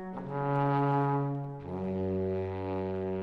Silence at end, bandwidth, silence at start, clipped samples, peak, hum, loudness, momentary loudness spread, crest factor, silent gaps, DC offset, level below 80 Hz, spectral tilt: 0 s; 4.9 kHz; 0 s; under 0.1%; -18 dBFS; none; -32 LUFS; 9 LU; 14 dB; none; under 0.1%; -62 dBFS; -10.5 dB/octave